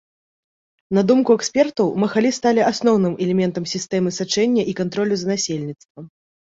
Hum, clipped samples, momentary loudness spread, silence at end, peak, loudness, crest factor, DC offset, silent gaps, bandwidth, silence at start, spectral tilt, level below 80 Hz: none; under 0.1%; 7 LU; 0.5 s; -4 dBFS; -19 LUFS; 16 dB; under 0.1%; 5.85-5.95 s; 8 kHz; 0.9 s; -5 dB/octave; -60 dBFS